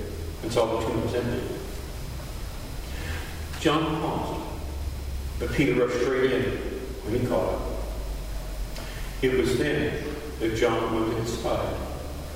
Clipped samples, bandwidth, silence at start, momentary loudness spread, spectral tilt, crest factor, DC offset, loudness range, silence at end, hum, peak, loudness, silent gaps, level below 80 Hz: under 0.1%; 16 kHz; 0 s; 12 LU; -5.5 dB/octave; 20 dB; under 0.1%; 4 LU; 0 s; none; -8 dBFS; -28 LUFS; none; -36 dBFS